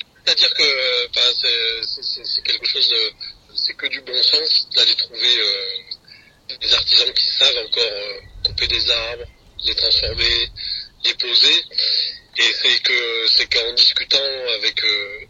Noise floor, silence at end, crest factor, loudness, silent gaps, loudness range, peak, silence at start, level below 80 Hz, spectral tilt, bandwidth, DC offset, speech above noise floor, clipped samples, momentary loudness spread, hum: -47 dBFS; 0.05 s; 18 dB; -15 LUFS; none; 3 LU; 0 dBFS; 0.25 s; -44 dBFS; -0.5 dB/octave; 9.4 kHz; under 0.1%; 29 dB; under 0.1%; 11 LU; none